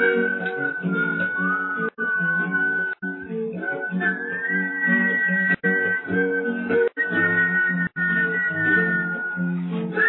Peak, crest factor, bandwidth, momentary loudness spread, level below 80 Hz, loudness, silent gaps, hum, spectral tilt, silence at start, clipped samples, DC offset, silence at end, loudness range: -8 dBFS; 14 dB; 4.2 kHz; 8 LU; -70 dBFS; -22 LUFS; none; none; -10 dB/octave; 0 s; under 0.1%; under 0.1%; 0 s; 3 LU